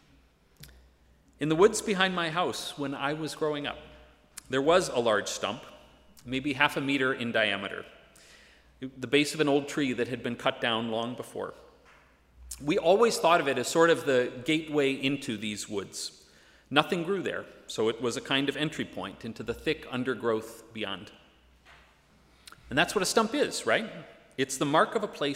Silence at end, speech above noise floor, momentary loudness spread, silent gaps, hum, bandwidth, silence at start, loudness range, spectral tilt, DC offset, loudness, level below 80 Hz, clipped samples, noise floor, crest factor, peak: 0 s; 33 dB; 15 LU; none; none; 16 kHz; 0.6 s; 6 LU; -4 dB/octave; under 0.1%; -28 LUFS; -62 dBFS; under 0.1%; -62 dBFS; 24 dB; -4 dBFS